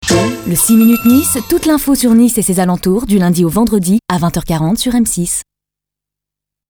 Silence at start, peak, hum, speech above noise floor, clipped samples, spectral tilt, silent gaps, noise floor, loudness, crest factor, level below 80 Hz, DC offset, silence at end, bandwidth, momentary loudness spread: 0 s; 0 dBFS; 50 Hz at -35 dBFS; 72 dB; under 0.1%; -5 dB/octave; none; -83 dBFS; -12 LUFS; 12 dB; -36 dBFS; under 0.1%; 1.35 s; over 20 kHz; 7 LU